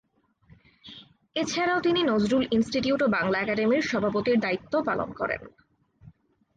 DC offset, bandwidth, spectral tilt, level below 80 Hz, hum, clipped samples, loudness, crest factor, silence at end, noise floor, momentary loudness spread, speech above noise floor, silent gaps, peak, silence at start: under 0.1%; 9.2 kHz; -5 dB/octave; -58 dBFS; none; under 0.1%; -26 LUFS; 14 dB; 0.45 s; -59 dBFS; 9 LU; 34 dB; none; -14 dBFS; 0.85 s